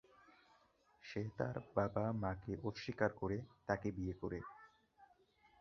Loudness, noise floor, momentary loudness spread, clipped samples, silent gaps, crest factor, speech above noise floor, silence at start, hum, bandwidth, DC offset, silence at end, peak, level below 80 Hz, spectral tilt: -42 LUFS; -73 dBFS; 10 LU; under 0.1%; none; 24 dB; 31 dB; 1.05 s; none; 6.8 kHz; under 0.1%; 0.55 s; -20 dBFS; -62 dBFS; -6.5 dB/octave